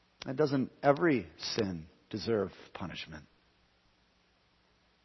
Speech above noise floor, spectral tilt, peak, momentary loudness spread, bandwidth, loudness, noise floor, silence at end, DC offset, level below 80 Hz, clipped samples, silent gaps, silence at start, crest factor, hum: 38 dB; -6 dB/octave; -12 dBFS; 16 LU; 6.2 kHz; -33 LUFS; -70 dBFS; 1.85 s; under 0.1%; -66 dBFS; under 0.1%; none; 0.2 s; 24 dB; none